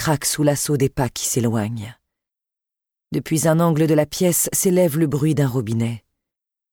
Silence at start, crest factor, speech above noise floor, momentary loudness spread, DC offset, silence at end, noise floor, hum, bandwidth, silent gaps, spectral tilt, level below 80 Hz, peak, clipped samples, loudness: 0 s; 16 dB; 68 dB; 11 LU; under 0.1%; 0.75 s; -87 dBFS; none; 19.5 kHz; none; -5 dB/octave; -50 dBFS; -4 dBFS; under 0.1%; -19 LUFS